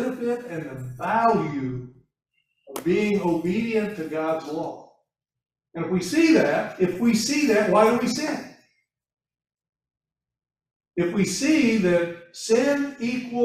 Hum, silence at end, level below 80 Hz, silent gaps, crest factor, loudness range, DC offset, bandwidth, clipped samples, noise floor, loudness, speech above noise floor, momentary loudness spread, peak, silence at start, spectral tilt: none; 0 s; -60 dBFS; 10.76-10.80 s; 20 dB; 6 LU; under 0.1%; 15.5 kHz; under 0.1%; -72 dBFS; -23 LUFS; 50 dB; 15 LU; -4 dBFS; 0 s; -5 dB/octave